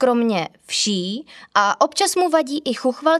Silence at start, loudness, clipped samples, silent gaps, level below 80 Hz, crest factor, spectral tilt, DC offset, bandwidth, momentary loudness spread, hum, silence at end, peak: 0 s; -20 LUFS; under 0.1%; none; -72 dBFS; 18 dB; -3 dB/octave; under 0.1%; 14 kHz; 7 LU; none; 0 s; -2 dBFS